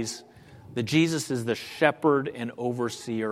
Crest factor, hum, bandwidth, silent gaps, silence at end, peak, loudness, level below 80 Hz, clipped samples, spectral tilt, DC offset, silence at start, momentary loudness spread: 22 dB; none; 15.5 kHz; none; 0 s; -4 dBFS; -27 LUFS; -66 dBFS; under 0.1%; -5 dB/octave; under 0.1%; 0 s; 11 LU